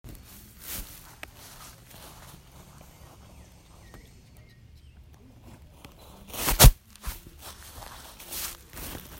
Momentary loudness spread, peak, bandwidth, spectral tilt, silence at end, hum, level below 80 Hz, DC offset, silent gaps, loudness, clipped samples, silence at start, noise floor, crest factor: 30 LU; -4 dBFS; 16.5 kHz; -3.5 dB/octave; 0.2 s; none; -34 dBFS; under 0.1%; none; -25 LUFS; under 0.1%; 0.05 s; -52 dBFS; 26 dB